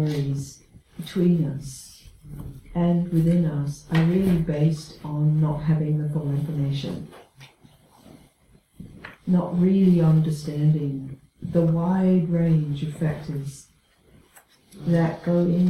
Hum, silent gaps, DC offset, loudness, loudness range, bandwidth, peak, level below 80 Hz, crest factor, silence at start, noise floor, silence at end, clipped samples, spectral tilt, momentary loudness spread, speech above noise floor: none; none; under 0.1%; -23 LUFS; 6 LU; 12.5 kHz; -8 dBFS; -50 dBFS; 16 dB; 0 s; -58 dBFS; 0 s; under 0.1%; -8.5 dB/octave; 18 LU; 36 dB